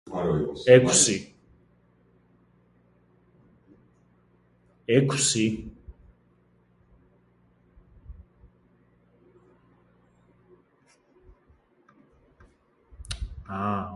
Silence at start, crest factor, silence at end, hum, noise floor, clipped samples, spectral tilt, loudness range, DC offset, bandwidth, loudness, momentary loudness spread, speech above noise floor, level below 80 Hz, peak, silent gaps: 0.05 s; 28 dB; 0 s; none; -64 dBFS; under 0.1%; -4 dB/octave; 20 LU; under 0.1%; 11.5 kHz; -23 LUFS; 22 LU; 42 dB; -50 dBFS; -2 dBFS; none